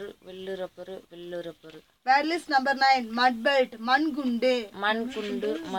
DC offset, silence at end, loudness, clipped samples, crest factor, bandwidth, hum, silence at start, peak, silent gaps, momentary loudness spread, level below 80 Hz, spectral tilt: under 0.1%; 0 s; -25 LUFS; under 0.1%; 18 dB; 17 kHz; none; 0 s; -10 dBFS; none; 18 LU; -68 dBFS; -4 dB/octave